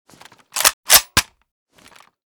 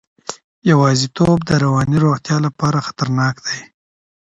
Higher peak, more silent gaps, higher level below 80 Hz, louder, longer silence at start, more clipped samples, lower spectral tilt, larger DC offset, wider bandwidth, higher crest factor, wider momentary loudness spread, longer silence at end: about the same, 0 dBFS vs 0 dBFS; second, 0.73-0.83 s vs 0.44-0.62 s; about the same, -46 dBFS vs -46 dBFS; about the same, -14 LUFS vs -16 LUFS; first, 0.55 s vs 0.3 s; first, 0.1% vs under 0.1%; second, 0.5 dB/octave vs -6 dB/octave; neither; first, over 20 kHz vs 8.8 kHz; about the same, 20 dB vs 16 dB; second, 9 LU vs 12 LU; first, 1.15 s vs 0.65 s